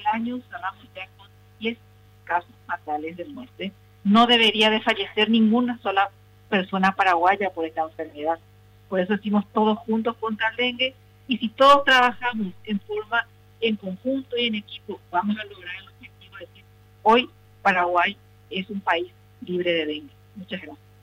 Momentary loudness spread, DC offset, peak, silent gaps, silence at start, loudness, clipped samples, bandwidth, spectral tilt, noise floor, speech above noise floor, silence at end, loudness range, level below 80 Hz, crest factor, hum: 19 LU; under 0.1%; -8 dBFS; none; 0 s; -22 LUFS; under 0.1%; 14 kHz; -5 dB/octave; -52 dBFS; 29 dB; 0.3 s; 8 LU; -60 dBFS; 16 dB; 50 Hz at -50 dBFS